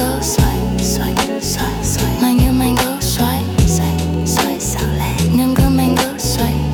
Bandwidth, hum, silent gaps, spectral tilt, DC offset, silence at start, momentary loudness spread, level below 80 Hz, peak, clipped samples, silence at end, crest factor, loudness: 19 kHz; none; none; -5 dB/octave; under 0.1%; 0 s; 5 LU; -24 dBFS; -2 dBFS; under 0.1%; 0 s; 14 dB; -16 LUFS